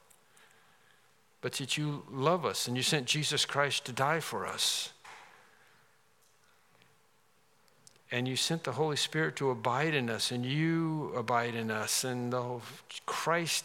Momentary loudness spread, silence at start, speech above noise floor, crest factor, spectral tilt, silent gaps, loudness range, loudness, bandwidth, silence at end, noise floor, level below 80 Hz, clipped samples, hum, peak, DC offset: 9 LU; 1.45 s; 37 dB; 22 dB; -3.5 dB/octave; none; 8 LU; -32 LUFS; 17 kHz; 0 s; -69 dBFS; -84 dBFS; under 0.1%; none; -12 dBFS; under 0.1%